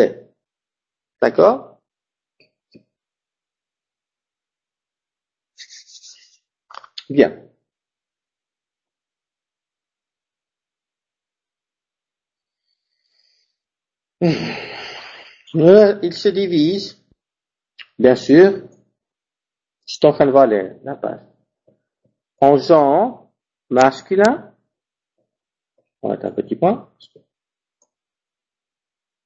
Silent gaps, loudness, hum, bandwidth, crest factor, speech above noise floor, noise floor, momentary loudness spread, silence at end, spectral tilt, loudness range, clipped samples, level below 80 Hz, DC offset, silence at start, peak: none; -15 LUFS; none; 8.2 kHz; 20 dB; 76 dB; -90 dBFS; 19 LU; 2.45 s; -6.5 dB/octave; 10 LU; under 0.1%; -62 dBFS; under 0.1%; 0 s; 0 dBFS